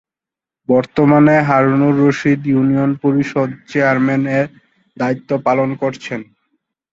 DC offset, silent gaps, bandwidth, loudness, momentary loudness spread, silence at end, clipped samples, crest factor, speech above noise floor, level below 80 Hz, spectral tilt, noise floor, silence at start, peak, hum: under 0.1%; none; 7.6 kHz; -15 LUFS; 11 LU; 0.7 s; under 0.1%; 14 dB; 73 dB; -54 dBFS; -8 dB/octave; -88 dBFS; 0.7 s; 0 dBFS; none